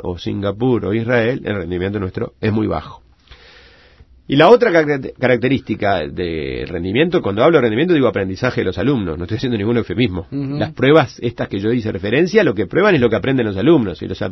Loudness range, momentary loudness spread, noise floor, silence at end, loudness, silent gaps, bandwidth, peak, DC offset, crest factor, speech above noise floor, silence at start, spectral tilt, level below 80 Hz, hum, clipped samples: 4 LU; 10 LU; -47 dBFS; 0 s; -16 LUFS; none; 6.2 kHz; 0 dBFS; under 0.1%; 16 dB; 31 dB; 0 s; -7.5 dB/octave; -42 dBFS; none; under 0.1%